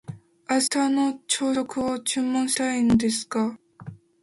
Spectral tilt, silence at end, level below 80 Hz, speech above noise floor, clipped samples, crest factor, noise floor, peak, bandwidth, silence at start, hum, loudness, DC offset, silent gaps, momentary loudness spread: -3.5 dB/octave; 0.3 s; -54 dBFS; 20 dB; under 0.1%; 16 dB; -43 dBFS; -8 dBFS; 12 kHz; 0.1 s; none; -24 LUFS; under 0.1%; none; 21 LU